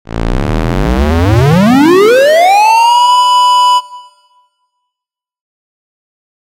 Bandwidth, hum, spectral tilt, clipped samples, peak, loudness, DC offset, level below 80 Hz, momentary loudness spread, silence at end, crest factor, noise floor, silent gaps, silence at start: 16.5 kHz; none; -5.5 dB/octave; 0.2%; 0 dBFS; -8 LUFS; under 0.1%; -22 dBFS; 8 LU; 2.5 s; 10 dB; -84 dBFS; none; 0.15 s